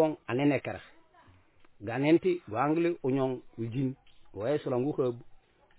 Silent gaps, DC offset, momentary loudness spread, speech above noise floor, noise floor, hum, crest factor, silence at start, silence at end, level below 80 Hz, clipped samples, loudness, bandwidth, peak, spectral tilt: none; under 0.1%; 16 LU; 31 dB; -60 dBFS; none; 18 dB; 0 s; 0.4 s; -66 dBFS; under 0.1%; -30 LUFS; 4 kHz; -14 dBFS; -6.5 dB/octave